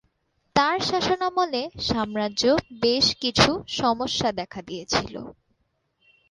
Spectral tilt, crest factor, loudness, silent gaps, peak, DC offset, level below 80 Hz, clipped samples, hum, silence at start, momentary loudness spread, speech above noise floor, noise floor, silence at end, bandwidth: -3.5 dB/octave; 24 dB; -23 LUFS; none; -2 dBFS; under 0.1%; -50 dBFS; under 0.1%; none; 0.55 s; 13 LU; 48 dB; -72 dBFS; 1 s; 11.5 kHz